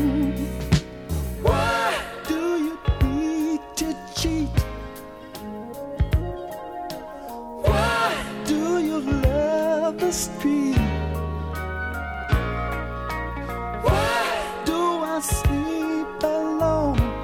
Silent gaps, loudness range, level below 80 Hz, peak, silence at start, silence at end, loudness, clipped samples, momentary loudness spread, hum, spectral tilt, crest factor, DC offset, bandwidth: none; 5 LU; -32 dBFS; -4 dBFS; 0 s; 0 s; -24 LUFS; under 0.1%; 12 LU; none; -5.5 dB/octave; 20 dB; under 0.1%; 18 kHz